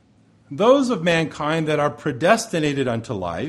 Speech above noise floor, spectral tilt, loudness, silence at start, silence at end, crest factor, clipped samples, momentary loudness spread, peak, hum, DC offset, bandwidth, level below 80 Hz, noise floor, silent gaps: 35 dB; -5.5 dB/octave; -20 LUFS; 0.5 s; 0 s; 18 dB; under 0.1%; 8 LU; -2 dBFS; none; under 0.1%; 12.5 kHz; -54 dBFS; -55 dBFS; none